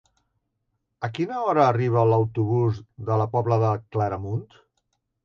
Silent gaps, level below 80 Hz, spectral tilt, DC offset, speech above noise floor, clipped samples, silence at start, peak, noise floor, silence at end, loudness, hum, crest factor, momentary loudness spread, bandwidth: none; -54 dBFS; -9 dB/octave; under 0.1%; 54 dB; under 0.1%; 1 s; -6 dBFS; -76 dBFS; 0.8 s; -24 LUFS; none; 18 dB; 12 LU; 6.8 kHz